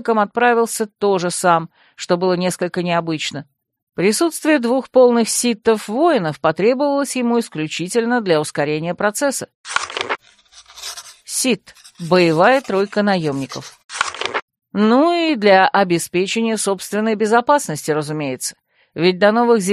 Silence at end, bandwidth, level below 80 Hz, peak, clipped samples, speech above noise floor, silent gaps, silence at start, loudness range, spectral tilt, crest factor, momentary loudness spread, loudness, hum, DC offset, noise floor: 0 s; 14 kHz; -64 dBFS; 0 dBFS; under 0.1%; 31 dB; 3.83-3.87 s, 9.55-9.64 s, 13.84-13.89 s, 14.42-14.48 s; 0 s; 4 LU; -4 dB/octave; 16 dB; 13 LU; -17 LUFS; none; under 0.1%; -48 dBFS